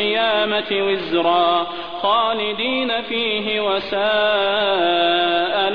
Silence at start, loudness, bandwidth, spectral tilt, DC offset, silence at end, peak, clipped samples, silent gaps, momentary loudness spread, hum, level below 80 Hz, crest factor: 0 s; -18 LUFS; 5.4 kHz; -6 dB/octave; 0.6%; 0 s; -6 dBFS; under 0.1%; none; 4 LU; none; -56 dBFS; 12 dB